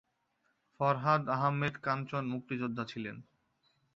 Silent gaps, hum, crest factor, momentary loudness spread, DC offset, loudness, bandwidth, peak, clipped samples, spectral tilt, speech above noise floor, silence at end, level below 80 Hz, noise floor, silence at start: none; none; 20 dB; 11 LU; under 0.1%; -33 LUFS; 7.4 kHz; -14 dBFS; under 0.1%; -5.5 dB/octave; 44 dB; 0.75 s; -72 dBFS; -78 dBFS; 0.8 s